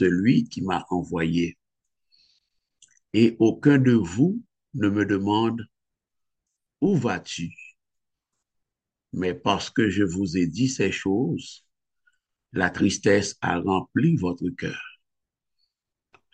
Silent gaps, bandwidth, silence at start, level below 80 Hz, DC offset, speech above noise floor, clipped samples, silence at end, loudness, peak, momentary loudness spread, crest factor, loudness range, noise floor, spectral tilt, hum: none; 9.2 kHz; 0 s; -58 dBFS; under 0.1%; 63 dB; under 0.1%; 1.45 s; -24 LUFS; -6 dBFS; 13 LU; 20 dB; 6 LU; -85 dBFS; -6 dB/octave; none